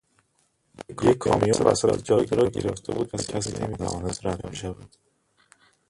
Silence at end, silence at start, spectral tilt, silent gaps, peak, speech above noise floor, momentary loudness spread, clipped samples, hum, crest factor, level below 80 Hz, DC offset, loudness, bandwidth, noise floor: 1 s; 0.8 s; -5.5 dB/octave; none; -4 dBFS; 45 dB; 14 LU; under 0.1%; none; 22 dB; -48 dBFS; under 0.1%; -25 LUFS; 11.5 kHz; -69 dBFS